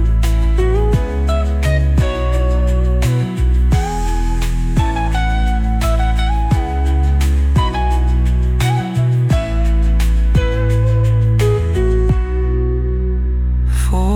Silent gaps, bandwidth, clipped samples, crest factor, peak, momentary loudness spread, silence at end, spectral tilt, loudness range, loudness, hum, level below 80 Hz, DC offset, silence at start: none; 13 kHz; under 0.1%; 10 dB; -4 dBFS; 4 LU; 0 s; -7 dB/octave; 2 LU; -16 LUFS; none; -16 dBFS; under 0.1%; 0 s